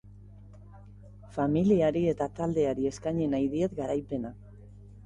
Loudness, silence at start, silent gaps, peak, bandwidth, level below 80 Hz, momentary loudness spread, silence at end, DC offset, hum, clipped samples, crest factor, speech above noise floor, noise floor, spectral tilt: -29 LUFS; 0.05 s; none; -14 dBFS; 11 kHz; -52 dBFS; 12 LU; 0 s; under 0.1%; 50 Hz at -45 dBFS; under 0.1%; 16 dB; 22 dB; -50 dBFS; -8 dB/octave